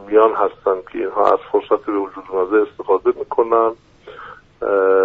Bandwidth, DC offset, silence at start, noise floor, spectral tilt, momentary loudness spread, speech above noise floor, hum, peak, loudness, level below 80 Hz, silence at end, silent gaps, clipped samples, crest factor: 4.5 kHz; under 0.1%; 0 s; -38 dBFS; -4 dB/octave; 16 LU; 21 dB; none; 0 dBFS; -18 LUFS; -56 dBFS; 0 s; none; under 0.1%; 18 dB